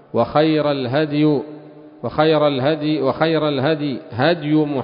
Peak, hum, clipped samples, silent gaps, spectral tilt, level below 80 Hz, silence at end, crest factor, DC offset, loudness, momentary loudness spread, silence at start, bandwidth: -2 dBFS; none; under 0.1%; none; -12 dB/octave; -54 dBFS; 0 s; 16 dB; under 0.1%; -18 LUFS; 7 LU; 0.15 s; 5.4 kHz